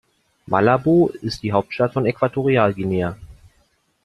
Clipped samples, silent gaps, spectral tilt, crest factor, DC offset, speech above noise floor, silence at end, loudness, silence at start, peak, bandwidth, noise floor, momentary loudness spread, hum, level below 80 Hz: under 0.1%; none; -8 dB/octave; 18 dB; under 0.1%; 44 dB; 0.75 s; -19 LUFS; 0.5 s; -2 dBFS; 12 kHz; -63 dBFS; 8 LU; none; -50 dBFS